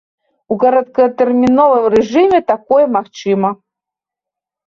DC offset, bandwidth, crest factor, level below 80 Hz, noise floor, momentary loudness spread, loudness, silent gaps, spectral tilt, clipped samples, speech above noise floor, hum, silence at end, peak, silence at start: under 0.1%; 7.4 kHz; 12 dB; -52 dBFS; -84 dBFS; 8 LU; -13 LUFS; none; -7 dB/octave; under 0.1%; 73 dB; none; 1.15 s; -2 dBFS; 0.5 s